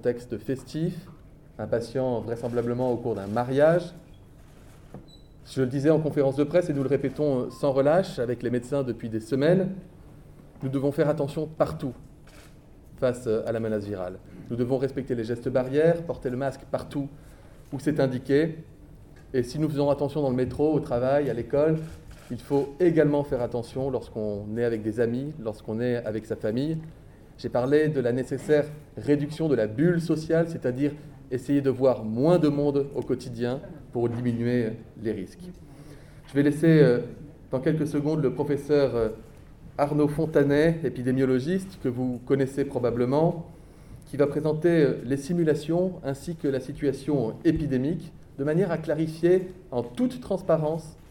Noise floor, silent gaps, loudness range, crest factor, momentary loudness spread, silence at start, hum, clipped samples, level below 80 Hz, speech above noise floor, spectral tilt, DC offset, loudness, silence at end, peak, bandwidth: -49 dBFS; none; 5 LU; 20 dB; 11 LU; 0.05 s; none; under 0.1%; -50 dBFS; 24 dB; -8 dB/octave; under 0.1%; -26 LUFS; 0 s; -6 dBFS; 17.5 kHz